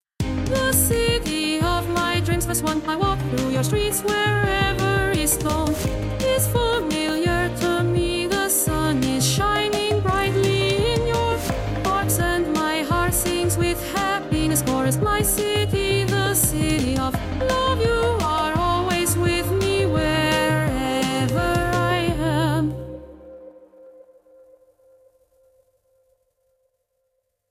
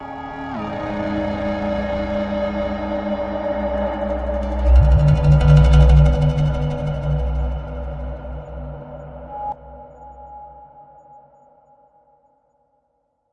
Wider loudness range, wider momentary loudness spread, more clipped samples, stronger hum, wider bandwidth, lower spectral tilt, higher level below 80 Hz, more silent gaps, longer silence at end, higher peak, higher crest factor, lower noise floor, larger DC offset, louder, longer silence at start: second, 2 LU vs 20 LU; second, 4 LU vs 22 LU; neither; neither; first, 16.5 kHz vs 6.6 kHz; second, -4.5 dB/octave vs -9 dB/octave; second, -34 dBFS vs -22 dBFS; neither; first, 3.6 s vs 2.5 s; second, -6 dBFS vs -2 dBFS; about the same, 16 dB vs 18 dB; first, -73 dBFS vs -68 dBFS; neither; about the same, -21 LUFS vs -19 LUFS; first, 0.2 s vs 0 s